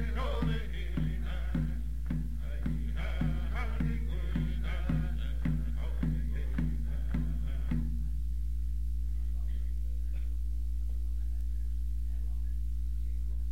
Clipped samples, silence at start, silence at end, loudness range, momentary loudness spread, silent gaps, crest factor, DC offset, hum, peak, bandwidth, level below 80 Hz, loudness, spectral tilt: under 0.1%; 0 s; 0 s; 2 LU; 3 LU; none; 12 dB; 1%; none; -18 dBFS; 4.9 kHz; -34 dBFS; -36 LUFS; -8 dB/octave